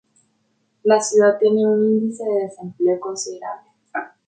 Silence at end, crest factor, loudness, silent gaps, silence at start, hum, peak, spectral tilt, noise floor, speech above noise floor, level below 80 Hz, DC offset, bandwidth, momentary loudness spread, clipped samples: 0.2 s; 16 dB; -19 LUFS; none; 0.85 s; none; -4 dBFS; -4.5 dB/octave; -67 dBFS; 49 dB; -72 dBFS; under 0.1%; 9.4 kHz; 15 LU; under 0.1%